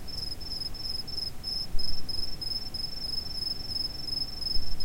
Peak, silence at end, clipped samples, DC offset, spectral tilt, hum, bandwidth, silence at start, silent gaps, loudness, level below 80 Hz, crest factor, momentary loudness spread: -12 dBFS; 0 s; under 0.1%; under 0.1%; -3 dB/octave; none; 16.5 kHz; 0 s; none; -32 LUFS; -38 dBFS; 14 dB; 3 LU